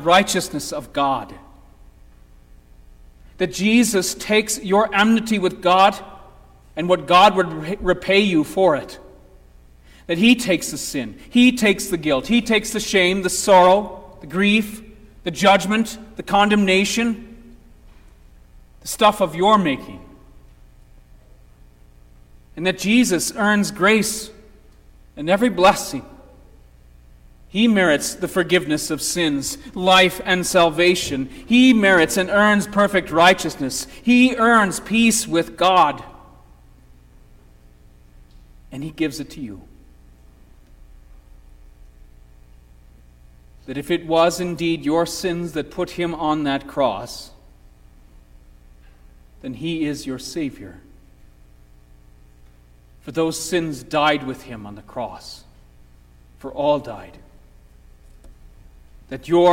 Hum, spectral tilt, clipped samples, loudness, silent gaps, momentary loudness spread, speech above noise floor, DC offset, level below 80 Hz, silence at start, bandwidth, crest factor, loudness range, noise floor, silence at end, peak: 60 Hz at -45 dBFS; -4 dB/octave; under 0.1%; -18 LUFS; none; 17 LU; 31 dB; under 0.1%; -46 dBFS; 0 s; 16.5 kHz; 18 dB; 14 LU; -49 dBFS; 0 s; -2 dBFS